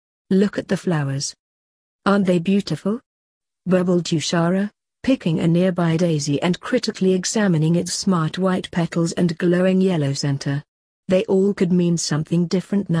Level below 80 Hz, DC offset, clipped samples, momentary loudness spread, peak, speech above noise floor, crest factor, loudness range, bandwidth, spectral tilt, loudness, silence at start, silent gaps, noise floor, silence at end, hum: -58 dBFS; under 0.1%; under 0.1%; 7 LU; -4 dBFS; over 71 dB; 16 dB; 2 LU; 10.5 kHz; -6 dB/octave; -20 LUFS; 0.3 s; 1.39-1.99 s, 3.06-3.41 s, 10.68-11.03 s; under -90 dBFS; 0 s; none